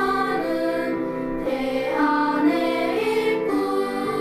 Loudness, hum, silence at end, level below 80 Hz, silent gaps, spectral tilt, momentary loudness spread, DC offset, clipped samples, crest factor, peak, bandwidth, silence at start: -23 LUFS; none; 0 s; -50 dBFS; none; -5.5 dB/octave; 6 LU; under 0.1%; under 0.1%; 14 dB; -8 dBFS; 15.5 kHz; 0 s